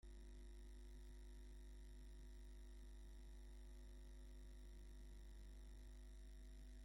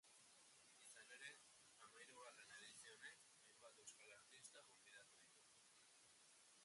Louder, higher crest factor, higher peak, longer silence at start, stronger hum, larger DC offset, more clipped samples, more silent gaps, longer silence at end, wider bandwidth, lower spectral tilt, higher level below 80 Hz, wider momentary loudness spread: about the same, -63 LUFS vs -64 LUFS; second, 8 dB vs 22 dB; second, -50 dBFS vs -46 dBFS; about the same, 0.05 s vs 0.05 s; neither; neither; neither; neither; about the same, 0 s vs 0 s; first, 16.5 kHz vs 11.5 kHz; first, -5.5 dB/octave vs 0 dB/octave; first, -58 dBFS vs under -90 dBFS; second, 0 LU vs 9 LU